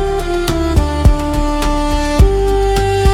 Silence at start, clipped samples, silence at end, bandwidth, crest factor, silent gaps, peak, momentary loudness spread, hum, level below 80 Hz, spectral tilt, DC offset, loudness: 0 s; 0.3%; 0 s; 15.5 kHz; 12 dB; none; 0 dBFS; 4 LU; none; -16 dBFS; -6 dB/octave; under 0.1%; -15 LUFS